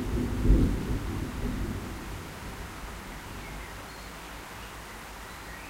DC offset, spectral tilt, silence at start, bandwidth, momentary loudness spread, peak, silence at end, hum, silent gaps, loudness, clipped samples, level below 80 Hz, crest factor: under 0.1%; -6 dB/octave; 0 s; 16 kHz; 16 LU; -10 dBFS; 0 s; none; none; -34 LUFS; under 0.1%; -34 dBFS; 22 dB